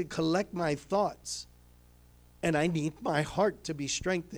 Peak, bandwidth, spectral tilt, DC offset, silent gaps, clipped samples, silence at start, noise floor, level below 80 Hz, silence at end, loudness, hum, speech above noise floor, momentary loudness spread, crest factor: -16 dBFS; over 20 kHz; -5 dB/octave; under 0.1%; none; under 0.1%; 0 s; -58 dBFS; -56 dBFS; 0 s; -31 LUFS; 60 Hz at -55 dBFS; 27 dB; 9 LU; 16 dB